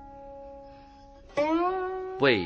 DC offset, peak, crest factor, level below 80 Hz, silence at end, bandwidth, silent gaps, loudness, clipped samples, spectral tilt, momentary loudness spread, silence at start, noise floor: under 0.1%; -10 dBFS; 20 dB; -56 dBFS; 0 s; 8 kHz; none; -28 LUFS; under 0.1%; -6 dB/octave; 21 LU; 0 s; -50 dBFS